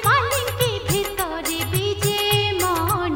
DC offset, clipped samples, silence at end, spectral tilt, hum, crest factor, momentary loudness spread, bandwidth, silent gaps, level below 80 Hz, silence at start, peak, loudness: under 0.1%; under 0.1%; 0 s; -3.5 dB/octave; none; 16 dB; 5 LU; 17 kHz; none; -42 dBFS; 0 s; -6 dBFS; -21 LUFS